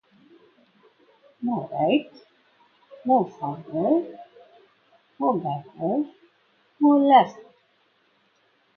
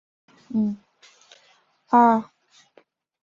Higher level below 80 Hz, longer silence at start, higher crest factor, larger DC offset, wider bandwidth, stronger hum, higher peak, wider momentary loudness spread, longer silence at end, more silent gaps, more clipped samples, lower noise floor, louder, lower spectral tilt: about the same, -76 dBFS vs -72 dBFS; first, 1.4 s vs 0.5 s; about the same, 22 dB vs 22 dB; neither; second, 6.4 kHz vs 7.4 kHz; neither; about the same, -4 dBFS vs -4 dBFS; second, 16 LU vs 20 LU; first, 1.35 s vs 1 s; neither; neither; first, -65 dBFS vs -61 dBFS; about the same, -23 LUFS vs -21 LUFS; about the same, -8 dB/octave vs -7.5 dB/octave